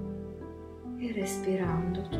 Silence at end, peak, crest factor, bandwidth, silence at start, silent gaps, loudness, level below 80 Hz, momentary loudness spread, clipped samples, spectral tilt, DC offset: 0 s; -18 dBFS; 14 dB; 15.5 kHz; 0 s; none; -34 LUFS; -50 dBFS; 14 LU; under 0.1%; -6.5 dB/octave; under 0.1%